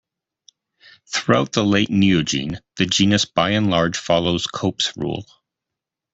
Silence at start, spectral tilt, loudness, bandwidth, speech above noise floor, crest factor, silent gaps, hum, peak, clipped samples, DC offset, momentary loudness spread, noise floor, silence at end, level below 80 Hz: 1.1 s; -4.5 dB/octave; -19 LUFS; 8 kHz; 66 dB; 18 dB; none; none; -2 dBFS; under 0.1%; under 0.1%; 9 LU; -85 dBFS; 0.9 s; -52 dBFS